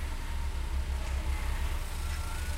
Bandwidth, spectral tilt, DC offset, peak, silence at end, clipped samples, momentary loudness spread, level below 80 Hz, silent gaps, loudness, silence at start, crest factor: 16 kHz; -4.5 dB/octave; under 0.1%; -22 dBFS; 0 s; under 0.1%; 3 LU; -32 dBFS; none; -36 LUFS; 0 s; 10 dB